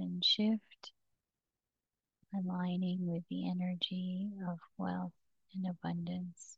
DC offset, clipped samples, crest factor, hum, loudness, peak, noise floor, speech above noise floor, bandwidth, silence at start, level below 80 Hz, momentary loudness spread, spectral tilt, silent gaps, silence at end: under 0.1%; under 0.1%; 18 dB; none; -37 LUFS; -22 dBFS; under -90 dBFS; over 53 dB; 8 kHz; 0 s; -80 dBFS; 13 LU; -6 dB/octave; none; 0.05 s